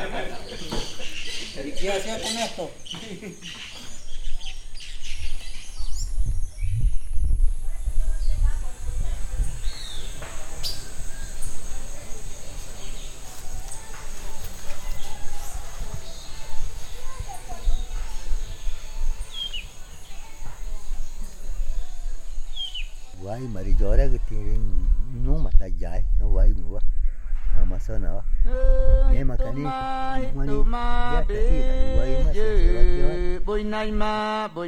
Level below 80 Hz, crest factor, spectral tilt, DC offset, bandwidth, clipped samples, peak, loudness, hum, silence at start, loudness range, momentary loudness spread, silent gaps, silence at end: -24 dBFS; 18 dB; -5 dB/octave; under 0.1%; 10.5 kHz; under 0.1%; -2 dBFS; -30 LUFS; none; 0 s; 12 LU; 15 LU; none; 0 s